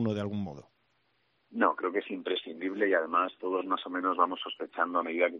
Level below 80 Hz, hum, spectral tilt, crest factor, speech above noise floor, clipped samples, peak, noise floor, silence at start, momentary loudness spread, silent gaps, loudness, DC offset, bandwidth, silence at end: -76 dBFS; none; -3.5 dB/octave; 22 dB; 43 dB; under 0.1%; -10 dBFS; -73 dBFS; 0 s; 10 LU; none; -31 LUFS; under 0.1%; 7 kHz; 0 s